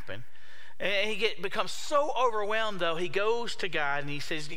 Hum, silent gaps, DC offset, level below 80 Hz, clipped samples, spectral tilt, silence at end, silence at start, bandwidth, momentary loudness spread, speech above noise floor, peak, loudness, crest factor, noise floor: none; none; 3%; -64 dBFS; under 0.1%; -3.5 dB/octave; 0 s; 0 s; 16.5 kHz; 7 LU; 24 dB; -12 dBFS; -30 LUFS; 20 dB; -54 dBFS